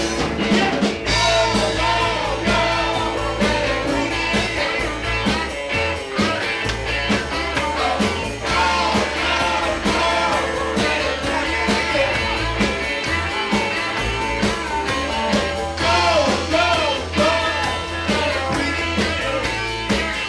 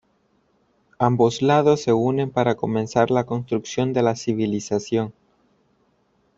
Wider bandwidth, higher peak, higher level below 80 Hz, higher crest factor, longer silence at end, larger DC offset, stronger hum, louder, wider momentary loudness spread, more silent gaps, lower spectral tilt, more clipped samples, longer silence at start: first, 11 kHz vs 7.8 kHz; second, -8 dBFS vs -4 dBFS; first, -34 dBFS vs -58 dBFS; second, 12 dB vs 20 dB; second, 0 s vs 1.25 s; neither; neither; about the same, -19 LUFS vs -21 LUFS; second, 4 LU vs 8 LU; neither; second, -4 dB/octave vs -6.5 dB/octave; neither; second, 0 s vs 1 s